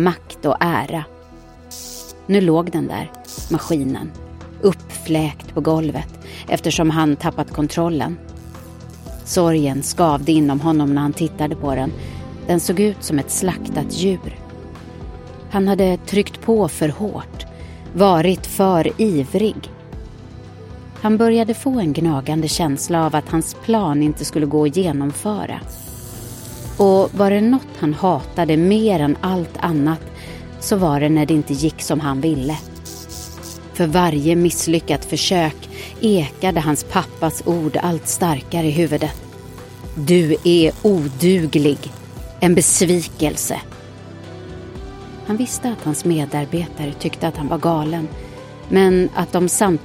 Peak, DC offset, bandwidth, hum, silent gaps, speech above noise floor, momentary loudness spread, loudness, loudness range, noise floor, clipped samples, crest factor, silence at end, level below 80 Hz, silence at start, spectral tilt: 0 dBFS; under 0.1%; 17 kHz; none; none; 24 dB; 19 LU; -18 LUFS; 4 LU; -41 dBFS; under 0.1%; 18 dB; 0 s; -40 dBFS; 0 s; -5.5 dB/octave